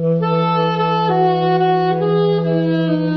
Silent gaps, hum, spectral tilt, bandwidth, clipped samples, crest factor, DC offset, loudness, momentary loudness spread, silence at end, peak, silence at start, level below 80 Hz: none; none; -9 dB/octave; 6 kHz; under 0.1%; 10 dB; 0.2%; -16 LUFS; 2 LU; 0 s; -6 dBFS; 0 s; -62 dBFS